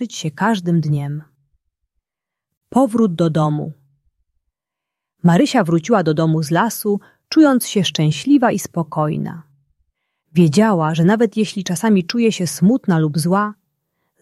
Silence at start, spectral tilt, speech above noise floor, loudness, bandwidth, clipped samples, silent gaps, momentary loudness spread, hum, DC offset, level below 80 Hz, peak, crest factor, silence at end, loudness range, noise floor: 0 s; -6 dB/octave; 69 dB; -17 LUFS; 13 kHz; under 0.1%; 2.57-2.61 s; 9 LU; none; under 0.1%; -60 dBFS; -2 dBFS; 16 dB; 0.7 s; 5 LU; -85 dBFS